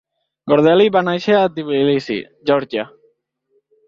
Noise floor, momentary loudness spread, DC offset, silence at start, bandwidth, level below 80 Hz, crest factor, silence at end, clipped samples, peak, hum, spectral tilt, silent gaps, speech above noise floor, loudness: -64 dBFS; 13 LU; under 0.1%; 0.45 s; 7.2 kHz; -60 dBFS; 16 dB; 1 s; under 0.1%; -2 dBFS; none; -7 dB/octave; none; 49 dB; -16 LUFS